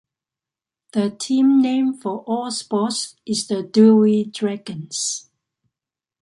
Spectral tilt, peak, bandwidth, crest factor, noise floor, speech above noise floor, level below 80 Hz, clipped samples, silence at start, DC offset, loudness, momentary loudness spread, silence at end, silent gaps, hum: -5 dB/octave; -4 dBFS; 11.5 kHz; 16 dB; -89 dBFS; 70 dB; -70 dBFS; under 0.1%; 0.95 s; under 0.1%; -19 LUFS; 13 LU; 1 s; none; none